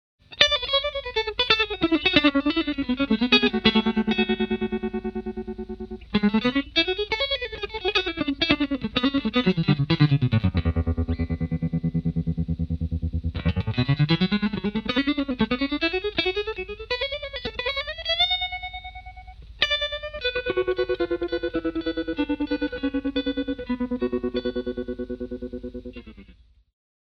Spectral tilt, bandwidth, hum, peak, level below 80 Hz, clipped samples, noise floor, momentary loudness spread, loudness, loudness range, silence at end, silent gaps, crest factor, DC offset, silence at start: -6.5 dB/octave; 7 kHz; none; 0 dBFS; -40 dBFS; under 0.1%; -53 dBFS; 12 LU; -24 LUFS; 6 LU; 0.7 s; none; 24 dB; under 0.1%; 0.3 s